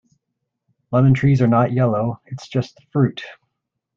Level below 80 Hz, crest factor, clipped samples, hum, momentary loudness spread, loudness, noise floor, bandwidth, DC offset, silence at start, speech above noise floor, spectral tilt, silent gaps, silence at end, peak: -52 dBFS; 16 dB; under 0.1%; none; 13 LU; -18 LUFS; -78 dBFS; 7 kHz; under 0.1%; 0.9 s; 60 dB; -9 dB/octave; none; 0.65 s; -4 dBFS